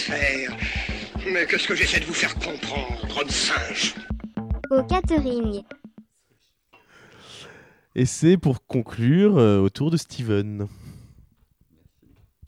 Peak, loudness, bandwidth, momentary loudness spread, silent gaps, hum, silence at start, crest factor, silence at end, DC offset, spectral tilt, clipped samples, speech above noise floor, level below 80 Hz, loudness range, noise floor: -6 dBFS; -23 LUFS; 13.5 kHz; 14 LU; none; none; 0 s; 18 dB; 1.5 s; under 0.1%; -5 dB/octave; under 0.1%; 46 dB; -38 dBFS; 6 LU; -68 dBFS